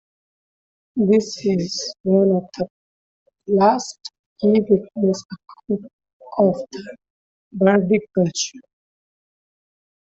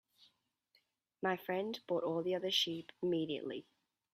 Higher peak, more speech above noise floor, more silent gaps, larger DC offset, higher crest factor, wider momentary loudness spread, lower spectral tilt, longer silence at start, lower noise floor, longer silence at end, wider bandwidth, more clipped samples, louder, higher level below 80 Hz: first, -4 dBFS vs -20 dBFS; first, over 71 dB vs 40 dB; first, 2.00-2.04 s, 2.70-3.26 s, 4.19-4.36 s, 5.25-5.29 s, 5.93-5.99 s, 6.13-6.20 s, 7.10-7.51 s vs none; neither; about the same, 18 dB vs 20 dB; first, 19 LU vs 8 LU; first, -6 dB/octave vs -4.5 dB/octave; second, 0.95 s vs 1.2 s; first, under -90 dBFS vs -77 dBFS; first, 1.55 s vs 0.5 s; second, 8 kHz vs 15.5 kHz; neither; first, -20 LUFS vs -38 LUFS; first, -62 dBFS vs -84 dBFS